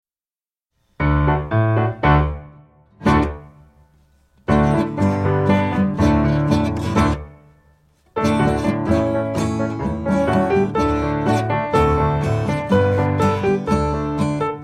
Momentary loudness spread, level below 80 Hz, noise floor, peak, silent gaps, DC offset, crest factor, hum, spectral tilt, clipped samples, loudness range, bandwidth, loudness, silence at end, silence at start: 6 LU; -32 dBFS; under -90 dBFS; -2 dBFS; none; under 0.1%; 16 dB; none; -7.5 dB/octave; under 0.1%; 3 LU; 12 kHz; -19 LUFS; 0 s; 1 s